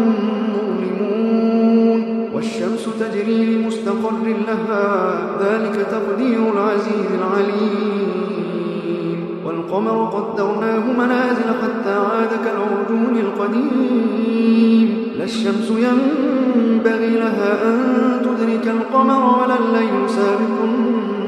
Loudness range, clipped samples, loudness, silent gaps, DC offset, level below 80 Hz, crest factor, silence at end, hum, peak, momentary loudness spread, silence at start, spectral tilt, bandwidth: 4 LU; under 0.1%; -18 LUFS; none; under 0.1%; -68 dBFS; 14 dB; 0 s; none; -2 dBFS; 7 LU; 0 s; -7 dB/octave; 10 kHz